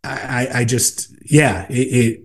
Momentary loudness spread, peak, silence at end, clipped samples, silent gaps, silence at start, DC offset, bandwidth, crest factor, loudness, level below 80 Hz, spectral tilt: 7 LU; 0 dBFS; 0.05 s; under 0.1%; none; 0.05 s; 0.2%; 12.5 kHz; 18 dB; -17 LUFS; -46 dBFS; -4.5 dB/octave